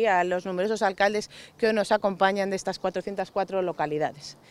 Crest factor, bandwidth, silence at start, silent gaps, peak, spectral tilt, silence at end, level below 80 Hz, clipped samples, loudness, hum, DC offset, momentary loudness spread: 20 dB; 13.5 kHz; 0 s; none; -6 dBFS; -4.5 dB/octave; 0.15 s; -62 dBFS; under 0.1%; -26 LUFS; none; under 0.1%; 8 LU